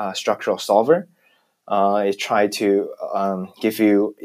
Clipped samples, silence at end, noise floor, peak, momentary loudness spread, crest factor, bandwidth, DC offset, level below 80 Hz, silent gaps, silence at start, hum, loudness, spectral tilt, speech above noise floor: under 0.1%; 0 s; -62 dBFS; -2 dBFS; 7 LU; 18 dB; 15.5 kHz; under 0.1%; -80 dBFS; none; 0 s; none; -20 LUFS; -5 dB/octave; 42 dB